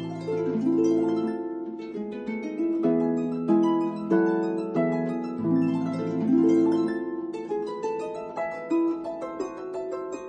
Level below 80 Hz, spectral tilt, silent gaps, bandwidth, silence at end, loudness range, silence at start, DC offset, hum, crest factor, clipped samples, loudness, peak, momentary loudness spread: -68 dBFS; -8 dB/octave; none; 8.4 kHz; 0 s; 3 LU; 0 s; under 0.1%; none; 16 dB; under 0.1%; -27 LUFS; -10 dBFS; 11 LU